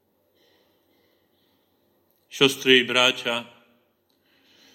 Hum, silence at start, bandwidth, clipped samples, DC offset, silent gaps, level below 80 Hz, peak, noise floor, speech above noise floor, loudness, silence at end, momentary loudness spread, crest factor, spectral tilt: none; 2.35 s; 16.5 kHz; under 0.1%; under 0.1%; none; -74 dBFS; 0 dBFS; -67 dBFS; 47 dB; -19 LUFS; 1.3 s; 13 LU; 26 dB; -2.5 dB/octave